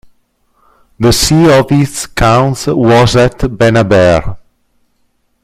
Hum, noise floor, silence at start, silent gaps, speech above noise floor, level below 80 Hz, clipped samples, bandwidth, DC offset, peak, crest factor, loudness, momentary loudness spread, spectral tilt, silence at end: none; -58 dBFS; 1 s; none; 50 dB; -28 dBFS; under 0.1%; 16 kHz; under 0.1%; 0 dBFS; 10 dB; -9 LUFS; 6 LU; -5.5 dB/octave; 1.05 s